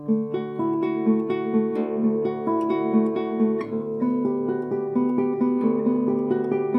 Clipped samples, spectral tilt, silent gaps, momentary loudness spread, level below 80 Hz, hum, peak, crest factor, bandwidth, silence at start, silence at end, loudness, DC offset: under 0.1%; -10 dB/octave; none; 4 LU; -72 dBFS; none; -10 dBFS; 14 dB; 5.2 kHz; 0 s; 0 s; -24 LUFS; under 0.1%